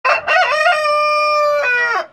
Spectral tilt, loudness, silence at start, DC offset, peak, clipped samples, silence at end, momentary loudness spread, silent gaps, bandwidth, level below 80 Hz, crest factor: -0.5 dB/octave; -14 LUFS; 0.05 s; under 0.1%; -2 dBFS; under 0.1%; 0.05 s; 1 LU; none; 13 kHz; -60 dBFS; 14 dB